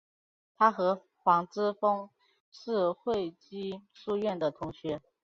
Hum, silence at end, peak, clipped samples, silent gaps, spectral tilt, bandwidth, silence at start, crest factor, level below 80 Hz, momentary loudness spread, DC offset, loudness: none; 0.25 s; -10 dBFS; under 0.1%; 2.40-2.52 s; -6.5 dB/octave; 7.4 kHz; 0.6 s; 22 dB; -68 dBFS; 13 LU; under 0.1%; -31 LUFS